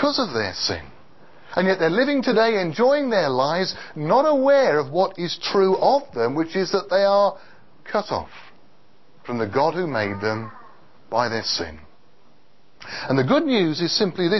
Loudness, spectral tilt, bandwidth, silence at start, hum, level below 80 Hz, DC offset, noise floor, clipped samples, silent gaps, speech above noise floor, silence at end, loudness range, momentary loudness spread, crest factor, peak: -21 LUFS; -5 dB/octave; 6.2 kHz; 0 s; none; -56 dBFS; 0.7%; -59 dBFS; under 0.1%; none; 38 dB; 0 s; 7 LU; 11 LU; 16 dB; -6 dBFS